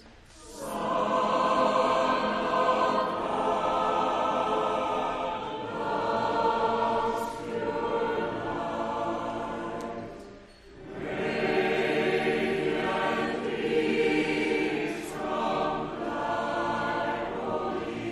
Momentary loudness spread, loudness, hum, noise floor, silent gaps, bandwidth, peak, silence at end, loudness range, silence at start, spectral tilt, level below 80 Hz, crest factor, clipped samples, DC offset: 9 LU; -28 LUFS; none; -50 dBFS; none; 14 kHz; -12 dBFS; 0 s; 6 LU; 0 s; -5 dB/octave; -56 dBFS; 16 dB; under 0.1%; under 0.1%